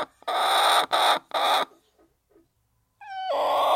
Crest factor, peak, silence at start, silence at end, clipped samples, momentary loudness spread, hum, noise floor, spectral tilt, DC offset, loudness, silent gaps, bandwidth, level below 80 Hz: 18 dB; -8 dBFS; 0 s; 0 s; under 0.1%; 13 LU; none; -71 dBFS; 0 dB/octave; under 0.1%; -23 LUFS; none; 16.5 kHz; -74 dBFS